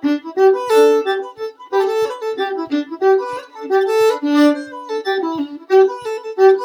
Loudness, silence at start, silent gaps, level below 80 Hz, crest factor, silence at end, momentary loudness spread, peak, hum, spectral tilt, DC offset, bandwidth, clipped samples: -17 LUFS; 0 s; none; -72 dBFS; 16 dB; 0 s; 12 LU; 0 dBFS; none; -3.5 dB/octave; under 0.1%; 18.5 kHz; under 0.1%